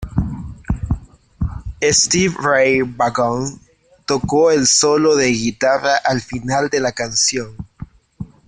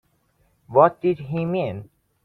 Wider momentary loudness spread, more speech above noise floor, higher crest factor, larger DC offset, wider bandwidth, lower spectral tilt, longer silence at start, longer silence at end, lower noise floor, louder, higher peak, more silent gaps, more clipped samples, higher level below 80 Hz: first, 15 LU vs 12 LU; second, 21 dB vs 44 dB; about the same, 16 dB vs 20 dB; neither; first, 10.5 kHz vs 4.4 kHz; second, -3.5 dB/octave vs -10 dB/octave; second, 0 s vs 0.7 s; second, 0.25 s vs 0.4 s; second, -37 dBFS vs -65 dBFS; first, -16 LUFS vs -21 LUFS; about the same, -2 dBFS vs -2 dBFS; neither; neither; first, -34 dBFS vs -60 dBFS